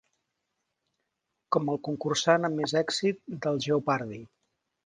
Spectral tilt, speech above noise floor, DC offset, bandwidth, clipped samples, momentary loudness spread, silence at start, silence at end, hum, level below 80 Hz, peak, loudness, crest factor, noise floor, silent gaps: -4.5 dB/octave; 54 dB; under 0.1%; 10 kHz; under 0.1%; 7 LU; 1.5 s; 0.6 s; none; -72 dBFS; -8 dBFS; -28 LUFS; 22 dB; -82 dBFS; none